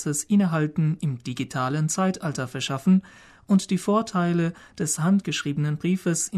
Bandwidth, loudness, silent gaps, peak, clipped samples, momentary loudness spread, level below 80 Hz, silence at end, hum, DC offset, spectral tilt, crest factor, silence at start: 13.5 kHz; -24 LUFS; none; -10 dBFS; under 0.1%; 7 LU; -62 dBFS; 0 s; none; under 0.1%; -5.5 dB/octave; 14 dB; 0 s